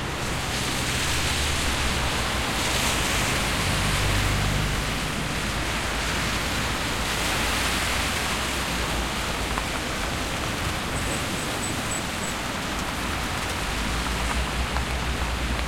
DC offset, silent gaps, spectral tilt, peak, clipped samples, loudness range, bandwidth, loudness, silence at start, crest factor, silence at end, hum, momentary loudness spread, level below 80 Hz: under 0.1%; none; -3 dB/octave; -8 dBFS; under 0.1%; 4 LU; 16.5 kHz; -25 LUFS; 0 s; 18 dB; 0 s; none; 4 LU; -34 dBFS